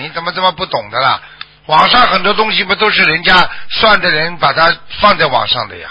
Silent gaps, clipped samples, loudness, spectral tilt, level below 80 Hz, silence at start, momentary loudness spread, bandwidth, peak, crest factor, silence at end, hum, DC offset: none; 0.1%; -11 LUFS; -5 dB/octave; -40 dBFS; 0 s; 8 LU; 8 kHz; 0 dBFS; 12 dB; 0 s; none; under 0.1%